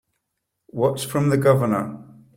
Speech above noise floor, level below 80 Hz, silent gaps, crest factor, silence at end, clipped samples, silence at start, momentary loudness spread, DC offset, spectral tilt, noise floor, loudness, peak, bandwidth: 58 dB; -58 dBFS; none; 18 dB; 0.35 s; under 0.1%; 0.75 s; 17 LU; under 0.1%; -6.5 dB/octave; -78 dBFS; -21 LUFS; -4 dBFS; 16.5 kHz